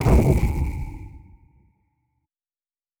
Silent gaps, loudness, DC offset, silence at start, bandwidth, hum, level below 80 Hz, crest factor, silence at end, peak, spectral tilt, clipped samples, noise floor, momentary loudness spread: none; -22 LUFS; under 0.1%; 0 s; 19 kHz; none; -28 dBFS; 18 dB; 1.8 s; -6 dBFS; -8 dB/octave; under 0.1%; under -90 dBFS; 23 LU